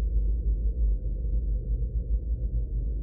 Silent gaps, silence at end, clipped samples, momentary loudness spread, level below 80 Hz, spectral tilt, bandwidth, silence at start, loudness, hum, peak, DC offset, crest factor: none; 0 s; under 0.1%; 3 LU; -26 dBFS; -18 dB/octave; 0.7 kHz; 0 s; -31 LUFS; none; -16 dBFS; under 0.1%; 10 dB